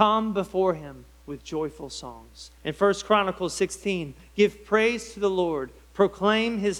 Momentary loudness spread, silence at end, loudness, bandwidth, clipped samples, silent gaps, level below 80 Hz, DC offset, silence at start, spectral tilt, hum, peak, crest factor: 16 LU; 0 s; -25 LUFS; 13.5 kHz; under 0.1%; none; -52 dBFS; under 0.1%; 0 s; -4.5 dB/octave; none; -4 dBFS; 20 dB